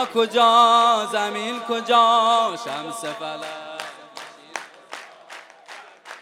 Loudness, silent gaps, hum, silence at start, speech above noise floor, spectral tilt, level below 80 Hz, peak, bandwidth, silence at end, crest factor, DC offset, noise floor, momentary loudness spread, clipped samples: -19 LUFS; none; none; 0 s; 24 dB; -2 dB/octave; -78 dBFS; -4 dBFS; 15.5 kHz; 0 s; 18 dB; under 0.1%; -43 dBFS; 26 LU; under 0.1%